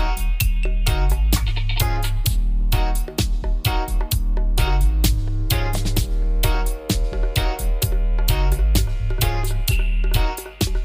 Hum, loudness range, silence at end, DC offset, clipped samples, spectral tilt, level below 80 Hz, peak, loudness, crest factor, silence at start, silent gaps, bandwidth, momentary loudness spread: none; 1 LU; 0 s; under 0.1%; under 0.1%; -4.5 dB/octave; -20 dBFS; -2 dBFS; -22 LUFS; 16 dB; 0 s; none; 16.5 kHz; 4 LU